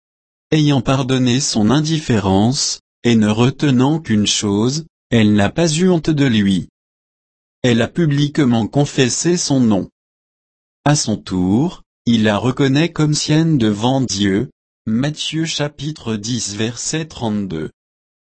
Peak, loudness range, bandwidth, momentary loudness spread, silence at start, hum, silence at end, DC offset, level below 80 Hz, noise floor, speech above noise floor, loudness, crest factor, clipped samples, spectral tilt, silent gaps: -2 dBFS; 4 LU; 8.8 kHz; 8 LU; 0.5 s; none; 0.55 s; under 0.1%; -46 dBFS; under -90 dBFS; over 75 dB; -16 LUFS; 14 dB; under 0.1%; -5 dB/octave; 2.80-3.02 s, 4.90-5.10 s, 6.69-7.62 s, 9.92-10.84 s, 11.86-12.05 s, 14.52-14.85 s